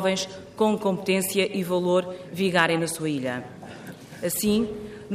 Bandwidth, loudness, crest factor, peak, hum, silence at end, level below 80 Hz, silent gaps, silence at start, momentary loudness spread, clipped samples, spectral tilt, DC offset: 15.5 kHz; -25 LUFS; 20 dB; -4 dBFS; none; 0 s; -58 dBFS; none; 0 s; 16 LU; under 0.1%; -4.5 dB/octave; under 0.1%